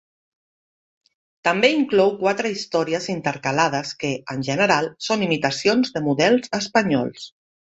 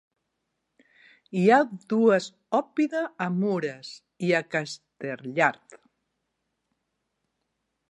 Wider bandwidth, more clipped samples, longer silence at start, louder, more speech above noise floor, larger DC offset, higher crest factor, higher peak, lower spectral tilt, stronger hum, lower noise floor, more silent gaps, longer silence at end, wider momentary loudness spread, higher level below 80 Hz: second, 8.2 kHz vs 11 kHz; neither; about the same, 1.45 s vs 1.35 s; first, -21 LUFS vs -25 LUFS; first, over 69 dB vs 54 dB; neither; about the same, 20 dB vs 22 dB; first, -2 dBFS vs -6 dBFS; second, -4.5 dB/octave vs -6 dB/octave; neither; first, under -90 dBFS vs -80 dBFS; neither; second, 0.5 s vs 2.15 s; second, 8 LU vs 15 LU; first, -62 dBFS vs -80 dBFS